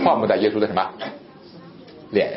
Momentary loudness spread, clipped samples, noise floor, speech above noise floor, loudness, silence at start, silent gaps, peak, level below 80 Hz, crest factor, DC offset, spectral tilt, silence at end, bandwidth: 25 LU; under 0.1%; -43 dBFS; 23 dB; -21 LUFS; 0 s; none; -4 dBFS; -62 dBFS; 18 dB; under 0.1%; -10.5 dB/octave; 0 s; 5.8 kHz